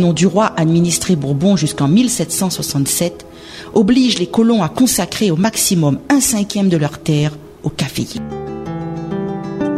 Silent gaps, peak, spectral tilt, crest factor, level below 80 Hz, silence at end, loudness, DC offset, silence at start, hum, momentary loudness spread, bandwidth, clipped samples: none; 0 dBFS; -5 dB/octave; 16 dB; -44 dBFS; 0 s; -15 LUFS; under 0.1%; 0 s; none; 12 LU; 16 kHz; under 0.1%